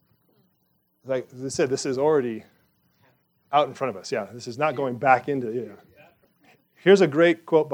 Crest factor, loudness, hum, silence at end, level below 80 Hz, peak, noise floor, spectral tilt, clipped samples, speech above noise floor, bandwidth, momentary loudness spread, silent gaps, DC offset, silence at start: 22 dB; -23 LUFS; none; 0 s; -74 dBFS; -4 dBFS; -69 dBFS; -5.5 dB/octave; under 0.1%; 46 dB; 11 kHz; 13 LU; none; under 0.1%; 1.05 s